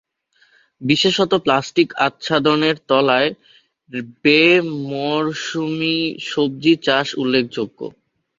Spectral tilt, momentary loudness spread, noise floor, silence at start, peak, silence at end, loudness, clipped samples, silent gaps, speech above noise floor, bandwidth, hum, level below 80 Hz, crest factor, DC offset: -5 dB/octave; 12 LU; -59 dBFS; 0.8 s; 0 dBFS; 0.5 s; -17 LUFS; under 0.1%; none; 41 dB; 7.6 kHz; none; -60 dBFS; 18 dB; under 0.1%